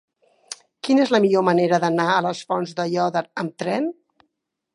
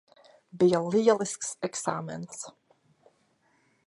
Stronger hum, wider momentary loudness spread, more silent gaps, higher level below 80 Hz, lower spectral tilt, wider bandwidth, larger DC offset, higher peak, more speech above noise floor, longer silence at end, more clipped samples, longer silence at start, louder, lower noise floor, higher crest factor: neither; second, 13 LU vs 16 LU; neither; about the same, -74 dBFS vs -74 dBFS; about the same, -5.5 dB/octave vs -5 dB/octave; about the same, 11.5 kHz vs 11.5 kHz; neither; first, -4 dBFS vs -8 dBFS; first, 55 dB vs 42 dB; second, 0.85 s vs 1.35 s; neither; about the same, 0.5 s vs 0.55 s; first, -21 LUFS vs -27 LUFS; first, -75 dBFS vs -69 dBFS; about the same, 18 dB vs 22 dB